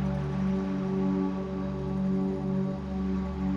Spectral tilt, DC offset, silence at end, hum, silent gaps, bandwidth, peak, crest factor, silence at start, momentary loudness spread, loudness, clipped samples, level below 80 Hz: -9.5 dB/octave; under 0.1%; 0 s; none; none; 6.8 kHz; -18 dBFS; 10 dB; 0 s; 4 LU; -30 LUFS; under 0.1%; -42 dBFS